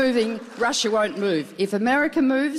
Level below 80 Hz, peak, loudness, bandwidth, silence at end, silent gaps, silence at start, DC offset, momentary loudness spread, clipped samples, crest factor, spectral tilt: -62 dBFS; -12 dBFS; -22 LUFS; 14 kHz; 0 s; none; 0 s; under 0.1%; 5 LU; under 0.1%; 10 dB; -4 dB/octave